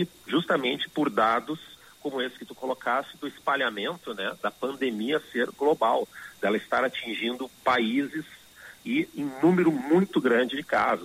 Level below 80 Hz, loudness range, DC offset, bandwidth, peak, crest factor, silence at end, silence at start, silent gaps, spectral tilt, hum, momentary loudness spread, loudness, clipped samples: -68 dBFS; 4 LU; under 0.1%; 16 kHz; -10 dBFS; 16 dB; 0 s; 0 s; none; -5.5 dB/octave; none; 12 LU; -27 LUFS; under 0.1%